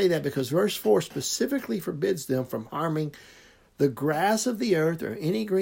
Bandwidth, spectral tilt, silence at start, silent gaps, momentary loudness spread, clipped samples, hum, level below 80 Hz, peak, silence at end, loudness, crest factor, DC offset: 16.5 kHz; -5 dB/octave; 0 s; none; 6 LU; under 0.1%; none; -64 dBFS; -10 dBFS; 0 s; -27 LUFS; 16 dB; under 0.1%